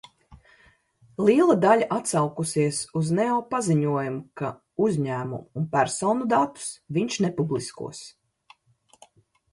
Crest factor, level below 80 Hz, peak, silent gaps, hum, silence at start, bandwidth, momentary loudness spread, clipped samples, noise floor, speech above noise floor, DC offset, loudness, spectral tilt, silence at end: 20 dB; -64 dBFS; -6 dBFS; none; none; 0.3 s; 11.5 kHz; 14 LU; under 0.1%; -62 dBFS; 38 dB; under 0.1%; -24 LUFS; -5.5 dB/octave; 1.45 s